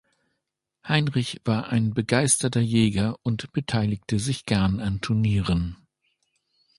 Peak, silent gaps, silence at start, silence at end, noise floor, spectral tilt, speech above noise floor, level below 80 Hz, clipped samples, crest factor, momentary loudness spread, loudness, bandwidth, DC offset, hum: -4 dBFS; none; 0.85 s; 1.05 s; -81 dBFS; -5 dB/octave; 58 dB; -44 dBFS; under 0.1%; 20 dB; 7 LU; -24 LUFS; 11.5 kHz; under 0.1%; none